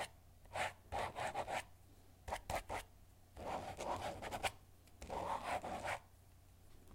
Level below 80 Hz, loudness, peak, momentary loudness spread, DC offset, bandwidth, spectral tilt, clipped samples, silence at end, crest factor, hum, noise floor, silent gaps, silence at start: -62 dBFS; -45 LUFS; -24 dBFS; 23 LU; under 0.1%; 16 kHz; -3.5 dB/octave; under 0.1%; 0 s; 22 dB; none; -64 dBFS; none; 0 s